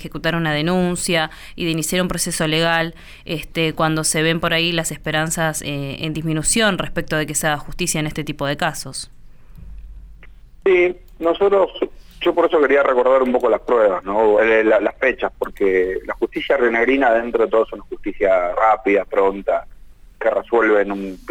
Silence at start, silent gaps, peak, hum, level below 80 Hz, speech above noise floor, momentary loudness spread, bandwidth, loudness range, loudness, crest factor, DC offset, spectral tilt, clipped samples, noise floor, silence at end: 0 s; none; -4 dBFS; none; -40 dBFS; 23 dB; 10 LU; over 20 kHz; 6 LU; -18 LUFS; 14 dB; under 0.1%; -4 dB/octave; under 0.1%; -41 dBFS; 0 s